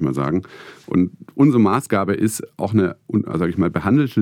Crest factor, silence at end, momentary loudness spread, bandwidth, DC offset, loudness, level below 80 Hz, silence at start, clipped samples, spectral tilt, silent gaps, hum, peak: 16 dB; 0 s; 8 LU; 17 kHz; under 0.1%; -19 LUFS; -54 dBFS; 0 s; under 0.1%; -7 dB/octave; none; none; -4 dBFS